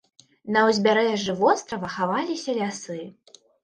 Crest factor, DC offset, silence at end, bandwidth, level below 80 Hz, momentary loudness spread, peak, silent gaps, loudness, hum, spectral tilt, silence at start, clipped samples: 18 dB; under 0.1%; 0.5 s; 10 kHz; -66 dBFS; 16 LU; -6 dBFS; none; -23 LUFS; none; -4.5 dB/octave; 0.45 s; under 0.1%